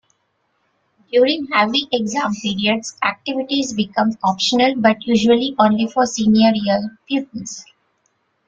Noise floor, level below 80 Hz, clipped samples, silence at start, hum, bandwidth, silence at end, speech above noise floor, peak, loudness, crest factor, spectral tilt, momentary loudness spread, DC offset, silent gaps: -67 dBFS; -58 dBFS; under 0.1%; 1.15 s; none; 7.8 kHz; 0.85 s; 50 dB; -2 dBFS; -17 LUFS; 18 dB; -4 dB/octave; 9 LU; under 0.1%; none